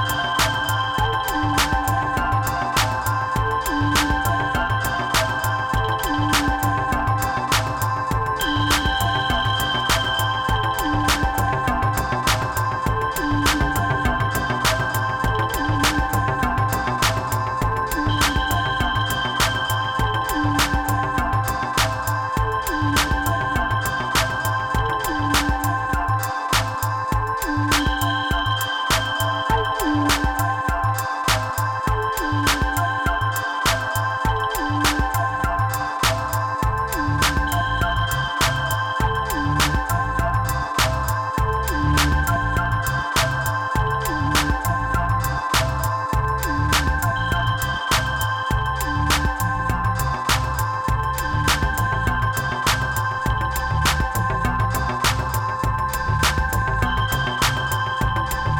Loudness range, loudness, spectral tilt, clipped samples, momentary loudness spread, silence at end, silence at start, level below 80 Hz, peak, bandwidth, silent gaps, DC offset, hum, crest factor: 1 LU; -21 LUFS; -4 dB/octave; under 0.1%; 3 LU; 0 s; 0 s; -30 dBFS; -10 dBFS; 20 kHz; none; under 0.1%; none; 10 dB